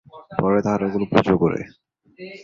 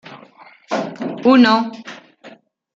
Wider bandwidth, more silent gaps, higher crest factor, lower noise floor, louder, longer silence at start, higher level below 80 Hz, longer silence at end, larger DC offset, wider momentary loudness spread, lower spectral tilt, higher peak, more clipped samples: about the same, 7.2 kHz vs 7.4 kHz; neither; about the same, 20 dB vs 16 dB; second, -40 dBFS vs -45 dBFS; second, -21 LUFS vs -16 LUFS; about the same, 0.15 s vs 0.1 s; first, -50 dBFS vs -66 dBFS; second, 0 s vs 0.45 s; neither; second, 21 LU vs 24 LU; first, -8 dB/octave vs -5.5 dB/octave; about the same, 0 dBFS vs -2 dBFS; neither